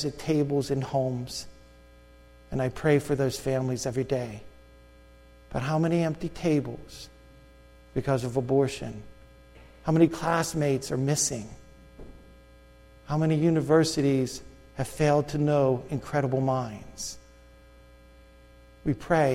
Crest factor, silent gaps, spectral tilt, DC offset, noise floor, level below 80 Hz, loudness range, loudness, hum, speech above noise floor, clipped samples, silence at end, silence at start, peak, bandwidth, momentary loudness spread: 20 dB; none; -6 dB/octave; under 0.1%; -53 dBFS; -50 dBFS; 5 LU; -27 LUFS; 60 Hz at -55 dBFS; 27 dB; under 0.1%; 0 s; 0 s; -8 dBFS; 16 kHz; 15 LU